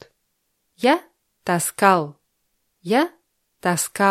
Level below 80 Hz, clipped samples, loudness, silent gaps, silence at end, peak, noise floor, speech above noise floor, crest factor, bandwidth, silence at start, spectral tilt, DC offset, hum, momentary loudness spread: -70 dBFS; under 0.1%; -21 LUFS; none; 0 s; 0 dBFS; -72 dBFS; 53 dB; 22 dB; 16.5 kHz; 0.8 s; -4 dB/octave; under 0.1%; none; 12 LU